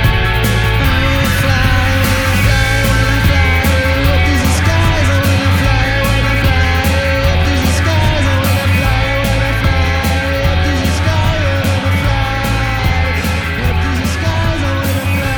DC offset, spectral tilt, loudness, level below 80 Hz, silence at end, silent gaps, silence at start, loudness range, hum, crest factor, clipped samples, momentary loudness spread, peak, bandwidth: under 0.1%; -5 dB/octave; -13 LUFS; -18 dBFS; 0 s; none; 0 s; 3 LU; none; 12 dB; under 0.1%; 3 LU; 0 dBFS; 19.5 kHz